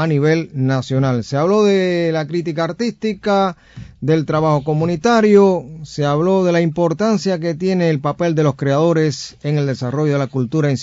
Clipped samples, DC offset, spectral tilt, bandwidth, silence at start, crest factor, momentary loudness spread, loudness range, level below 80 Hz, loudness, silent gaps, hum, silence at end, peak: under 0.1%; under 0.1%; -7 dB/octave; 7.8 kHz; 0 s; 16 dB; 7 LU; 2 LU; -50 dBFS; -17 LUFS; none; none; 0 s; 0 dBFS